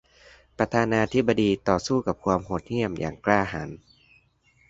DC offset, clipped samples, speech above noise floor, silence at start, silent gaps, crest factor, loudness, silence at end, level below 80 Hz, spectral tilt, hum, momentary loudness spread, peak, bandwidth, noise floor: under 0.1%; under 0.1%; 38 dB; 0.6 s; none; 22 dB; -25 LUFS; 0.95 s; -50 dBFS; -6 dB/octave; none; 7 LU; -4 dBFS; 8 kHz; -63 dBFS